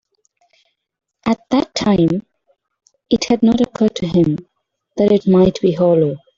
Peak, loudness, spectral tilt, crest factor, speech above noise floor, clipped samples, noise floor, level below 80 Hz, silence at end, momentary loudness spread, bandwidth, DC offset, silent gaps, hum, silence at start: -2 dBFS; -16 LUFS; -7 dB/octave; 14 dB; 48 dB; under 0.1%; -63 dBFS; -46 dBFS; 0.2 s; 8 LU; 7.6 kHz; under 0.1%; none; none; 1.25 s